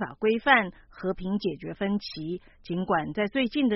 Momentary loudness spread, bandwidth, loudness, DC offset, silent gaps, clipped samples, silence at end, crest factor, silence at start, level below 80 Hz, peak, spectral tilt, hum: 14 LU; 5.8 kHz; -27 LUFS; under 0.1%; none; under 0.1%; 0 s; 22 dB; 0 s; -54 dBFS; -6 dBFS; -3.5 dB/octave; none